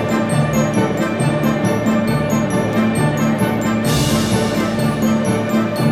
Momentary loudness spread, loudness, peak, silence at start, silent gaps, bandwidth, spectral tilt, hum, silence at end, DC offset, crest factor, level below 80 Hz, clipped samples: 2 LU; -17 LUFS; -4 dBFS; 0 s; none; 15.5 kHz; -6 dB/octave; none; 0 s; 0.3%; 12 dB; -40 dBFS; under 0.1%